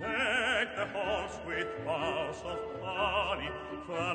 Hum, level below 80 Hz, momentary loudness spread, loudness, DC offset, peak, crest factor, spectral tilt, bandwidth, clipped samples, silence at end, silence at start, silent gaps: none; -54 dBFS; 10 LU; -33 LUFS; under 0.1%; -18 dBFS; 16 dB; -4 dB/octave; 9.4 kHz; under 0.1%; 0 s; 0 s; none